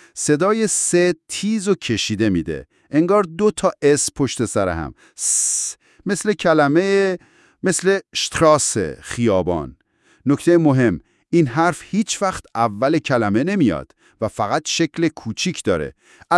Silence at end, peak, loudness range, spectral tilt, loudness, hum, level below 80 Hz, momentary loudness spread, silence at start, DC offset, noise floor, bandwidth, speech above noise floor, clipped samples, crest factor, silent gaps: 0 s; -2 dBFS; 2 LU; -4.5 dB/octave; -19 LUFS; none; -50 dBFS; 10 LU; 0.15 s; under 0.1%; -51 dBFS; 12 kHz; 33 dB; under 0.1%; 18 dB; none